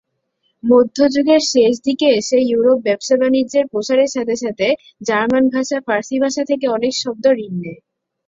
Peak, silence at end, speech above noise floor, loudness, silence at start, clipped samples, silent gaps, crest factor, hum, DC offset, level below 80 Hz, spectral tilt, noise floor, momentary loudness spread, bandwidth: -2 dBFS; 0.5 s; 52 dB; -16 LUFS; 0.65 s; under 0.1%; none; 14 dB; none; under 0.1%; -58 dBFS; -4 dB/octave; -68 dBFS; 7 LU; 7.8 kHz